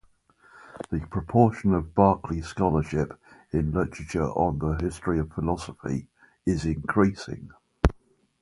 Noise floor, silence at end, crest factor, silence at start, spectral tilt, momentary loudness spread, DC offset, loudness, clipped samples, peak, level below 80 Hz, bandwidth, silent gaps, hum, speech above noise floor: -59 dBFS; 0.5 s; 26 dB; 0.55 s; -8 dB/octave; 11 LU; under 0.1%; -26 LUFS; under 0.1%; 0 dBFS; -38 dBFS; 11.5 kHz; none; none; 34 dB